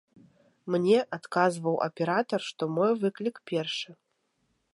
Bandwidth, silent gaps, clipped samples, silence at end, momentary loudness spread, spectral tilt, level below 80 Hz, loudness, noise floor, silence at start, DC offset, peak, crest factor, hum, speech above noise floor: 11.5 kHz; none; under 0.1%; 0.8 s; 10 LU; -5.5 dB/octave; -82 dBFS; -28 LUFS; -75 dBFS; 0.65 s; under 0.1%; -10 dBFS; 20 dB; none; 47 dB